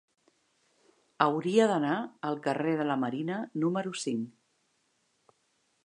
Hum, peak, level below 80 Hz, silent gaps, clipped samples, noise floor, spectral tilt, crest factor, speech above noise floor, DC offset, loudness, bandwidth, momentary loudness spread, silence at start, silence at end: none; -8 dBFS; -84 dBFS; none; under 0.1%; -74 dBFS; -5.5 dB/octave; 24 dB; 45 dB; under 0.1%; -30 LUFS; 11 kHz; 9 LU; 1.2 s; 1.55 s